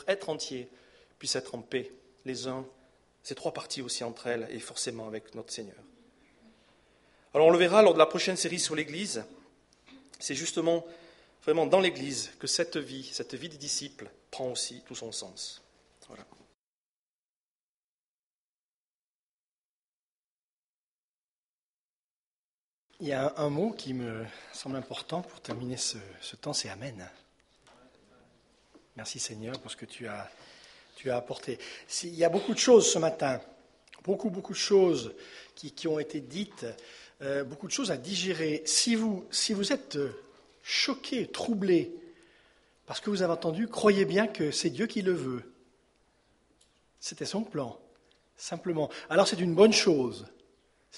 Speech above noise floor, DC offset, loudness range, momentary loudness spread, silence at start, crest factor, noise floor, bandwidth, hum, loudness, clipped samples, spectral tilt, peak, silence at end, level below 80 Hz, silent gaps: over 60 dB; under 0.1%; 14 LU; 18 LU; 0 s; 26 dB; under -90 dBFS; 11.5 kHz; none; -30 LUFS; under 0.1%; -3.5 dB/octave; -6 dBFS; 0 s; -72 dBFS; 16.54-22.90 s